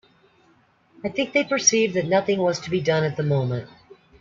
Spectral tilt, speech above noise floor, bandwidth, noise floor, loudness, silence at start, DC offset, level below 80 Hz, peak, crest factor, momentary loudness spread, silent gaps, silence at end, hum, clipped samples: -4 dB/octave; 38 dB; 7.6 kHz; -60 dBFS; -22 LUFS; 1.05 s; under 0.1%; -62 dBFS; -4 dBFS; 20 dB; 11 LU; none; 0.55 s; none; under 0.1%